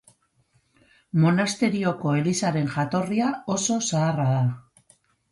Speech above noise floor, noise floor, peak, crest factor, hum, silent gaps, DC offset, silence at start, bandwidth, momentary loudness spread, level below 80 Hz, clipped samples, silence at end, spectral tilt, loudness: 43 dB; -66 dBFS; -8 dBFS; 16 dB; none; none; under 0.1%; 1.15 s; 11.5 kHz; 5 LU; -62 dBFS; under 0.1%; 0.7 s; -5.5 dB/octave; -24 LUFS